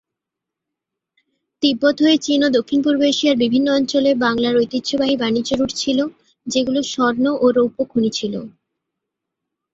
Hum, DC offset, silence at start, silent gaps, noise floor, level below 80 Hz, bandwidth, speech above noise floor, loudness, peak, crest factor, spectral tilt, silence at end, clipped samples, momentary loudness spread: none; under 0.1%; 1.6 s; none; -84 dBFS; -56 dBFS; 7.8 kHz; 67 dB; -18 LUFS; -2 dBFS; 16 dB; -4 dB/octave; 1.25 s; under 0.1%; 5 LU